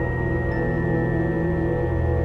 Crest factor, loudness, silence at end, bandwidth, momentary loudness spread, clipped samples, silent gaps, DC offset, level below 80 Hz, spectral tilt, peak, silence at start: 12 dB; -23 LUFS; 0 s; 5.6 kHz; 1 LU; under 0.1%; none; 0.3%; -32 dBFS; -10.5 dB/octave; -12 dBFS; 0 s